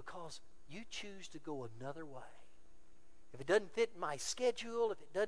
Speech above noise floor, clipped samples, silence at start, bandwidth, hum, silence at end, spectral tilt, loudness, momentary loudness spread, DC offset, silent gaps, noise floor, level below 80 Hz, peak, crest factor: 26 dB; under 0.1%; 0.05 s; 11 kHz; none; 0 s; -3 dB/octave; -40 LUFS; 19 LU; 0.4%; none; -66 dBFS; -70 dBFS; -20 dBFS; 22 dB